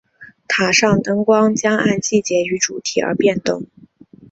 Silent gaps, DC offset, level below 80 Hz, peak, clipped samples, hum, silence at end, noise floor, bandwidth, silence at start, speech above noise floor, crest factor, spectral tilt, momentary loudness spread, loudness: none; under 0.1%; -54 dBFS; 0 dBFS; under 0.1%; none; 0.65 s; -45 dBFS; 8 kHz; 0.2 s; 28 dB; 18 dB; -4 dB/octave; 8 LU; -16 LUFS